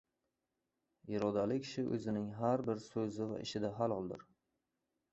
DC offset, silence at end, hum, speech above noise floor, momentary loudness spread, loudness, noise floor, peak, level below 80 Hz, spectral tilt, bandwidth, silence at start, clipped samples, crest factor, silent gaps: under 0.1%; 0.9 s; none; 50 dB; 7 LU; -39 LUFS; -88 dBFS; -20 dBFS; -72 dBFS; -6.5 dB/octave; 8 kHz; 1.05 s; under 0.1%; 20 dB; none